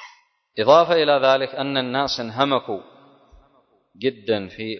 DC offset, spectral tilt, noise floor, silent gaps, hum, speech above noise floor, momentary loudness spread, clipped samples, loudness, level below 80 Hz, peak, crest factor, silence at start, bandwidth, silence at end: under 0.1%; -5 dB/octave; -60 dBFS; none; none; 41 dB; 12 LU; under 0.1%; -20 LUFS; -60 dBFS; 0 dBFS; 20 dB; 0 s; 6.4 kHz; 0 s